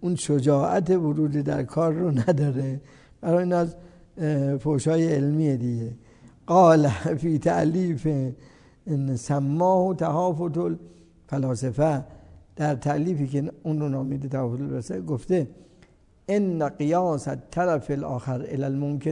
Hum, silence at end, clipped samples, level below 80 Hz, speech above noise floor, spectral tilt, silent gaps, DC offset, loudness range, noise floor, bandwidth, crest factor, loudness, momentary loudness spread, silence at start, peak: none; 0 s; under 0.1%; -56 dBFS; 33 dB; -8 dB/octave; none; under 0.1%; 5 LU; -56 dBFS; 10.5 kHz; 18 dB; -24 LUFS; 9 LU; 0 s; -6 dBFS